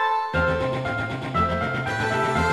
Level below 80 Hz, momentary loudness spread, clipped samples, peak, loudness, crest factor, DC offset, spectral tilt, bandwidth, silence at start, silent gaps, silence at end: -40 dBFS; 4 LU; under 0.1%; -10 dBFS; -24 LUFS; 14 dB; under 0.1%; -6 dB/octave; 13 kHz; 0 s; none; 0 s